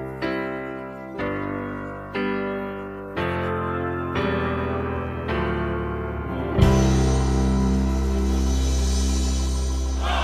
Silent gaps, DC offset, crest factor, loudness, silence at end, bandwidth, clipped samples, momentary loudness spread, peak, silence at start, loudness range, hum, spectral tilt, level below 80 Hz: none; under 0.1%; 20 dB; -24 LUFS; 0 s; 12.5 kHz; under 0.1%; 10 LU; -4 dBFS; 0 s; 7 LU; none; -6 dB/octave; -26 dBFS